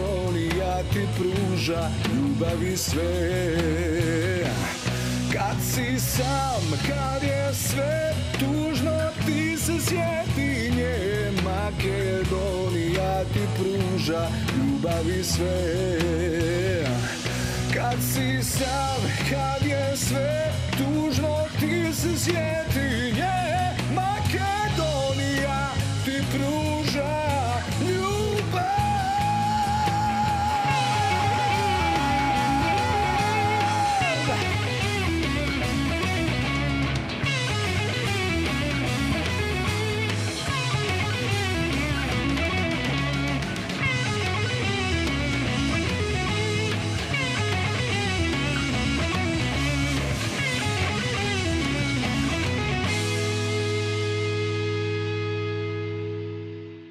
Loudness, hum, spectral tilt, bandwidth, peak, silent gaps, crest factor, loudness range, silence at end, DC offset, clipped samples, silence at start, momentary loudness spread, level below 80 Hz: -25 LUFS; none; -5 dB/octave; 16 kHz; -10 dBFS; none; 14 dB; 2 LU; 0 s; under 0.1%; under 0.1%; 0 s; 3 LU; -38 dBFS